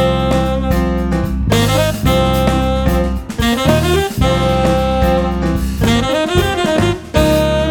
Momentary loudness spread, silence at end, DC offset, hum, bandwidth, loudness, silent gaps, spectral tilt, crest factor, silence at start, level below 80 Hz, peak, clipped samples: 4 LU; 0 s; under 0.1%; none; 19.5 kHz; -14 LUFS; none; -6 dB/octave; 14 dB; 0 s; -22 dBFS; 0 dBFS; under 0.1%